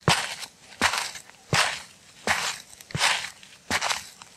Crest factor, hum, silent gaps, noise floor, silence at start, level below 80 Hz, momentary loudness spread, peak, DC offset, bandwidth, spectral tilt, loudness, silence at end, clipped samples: 24 dB; none; none; -46 dBFS; 0.05 s; -56 dBFS; 15 LU; -6 dBFS; under 0.1%; 16 kHz; -2 dB/octave; -26 LUFS; 0.1 s; under 0.1%